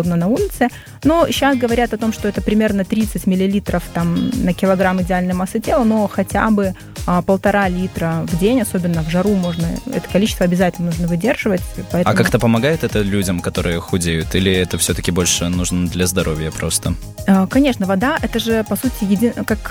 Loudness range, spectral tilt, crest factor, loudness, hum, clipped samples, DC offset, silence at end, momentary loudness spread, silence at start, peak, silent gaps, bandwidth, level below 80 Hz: 1 LU; -5 dB/octave; 14 dB; -17 LUFS; none; under 0.1%; under 0.1%; 0 s; 5 LU; 0 s; -2 dBFS; none; 19 kHz; -32 dBFS